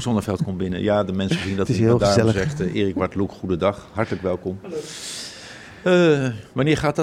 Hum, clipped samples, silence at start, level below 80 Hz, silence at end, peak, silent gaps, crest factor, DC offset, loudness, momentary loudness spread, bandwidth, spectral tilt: none; under 0.1%; 0 s; -46 dBFS; 0 s; -4 dBFS; none; 18 dB; under 0.1%; -21 LUFS; 14 LU; 14 kHz; -6 dB/octave